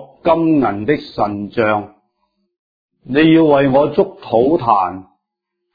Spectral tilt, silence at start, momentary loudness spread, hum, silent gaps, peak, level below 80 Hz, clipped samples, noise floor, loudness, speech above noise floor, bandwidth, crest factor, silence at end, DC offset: -9.5 dB/octave; 0 s; 9 LU; none; 2.59-2.89 s; 0 dBFS; -48 dBFS; under 0.1%; -77 dBFS; -15 LUFS; 63 dB; 5 kHz; 16 dB; 0.75 s; under 0.1%